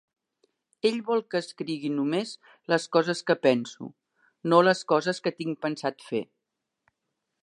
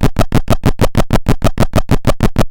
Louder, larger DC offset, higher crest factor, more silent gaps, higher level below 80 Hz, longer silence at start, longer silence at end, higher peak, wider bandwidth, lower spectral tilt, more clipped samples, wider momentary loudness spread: second, -26 LUFS vs -15 LUFS; neither; first, 24 dB vs 10 dB; neither; second, -80 dBFS vs -16 dBFS; first, 0.85 s vs 0 s; first, 1.2 s vs 0 s; second, -4 dBFS vs 0 dBFS; second, 11 kHz vs 17 kHz; second, -5 dB/octave vs -6.5 dB/octave; neither; first, 15 LU vs 2 LU